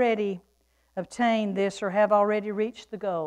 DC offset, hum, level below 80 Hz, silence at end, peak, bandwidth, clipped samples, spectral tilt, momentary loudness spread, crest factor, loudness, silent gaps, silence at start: under 0.1%; none; -68 dBFS; 0 s; -10 dBFS; 10.5 kHz; under 0.1%; -6 dB/octave; 15 LU; 16 dB; -26 LUFS; none; 0 s